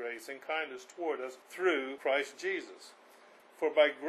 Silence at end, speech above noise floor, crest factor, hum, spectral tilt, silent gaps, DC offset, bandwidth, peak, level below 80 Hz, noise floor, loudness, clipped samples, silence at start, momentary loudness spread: 0 s; 25 dB; 22 dB; none; -2 dB/octave; none; under 0.1%; 13 kHz; -12 dBFS; under -90 dBFS; -59 dBFS; -34 LUFS; under 0.1%; 0 s; 13 LU